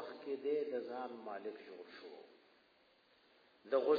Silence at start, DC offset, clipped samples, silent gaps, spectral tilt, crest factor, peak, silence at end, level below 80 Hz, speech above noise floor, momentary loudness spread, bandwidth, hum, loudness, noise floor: 0 s; under 0.1%; under 0.1%; none; -2.5 dB/octave; 22 dB; -20 dBFS; 0 s; under -90 dBFS; 32 dB; 19 LU; 5 kHz; none; -43 LUFS; -71 dBFS